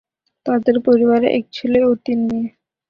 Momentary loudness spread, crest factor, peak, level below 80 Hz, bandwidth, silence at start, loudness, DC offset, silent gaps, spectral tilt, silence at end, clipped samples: 10 LU; 16 dB; -2 dBFS; -54 dBFS; 5.6 kHz; 0.45 s; -17 LUFS; under 0.1%; none; -8 dB/octave; 0.4 s; under 0.1%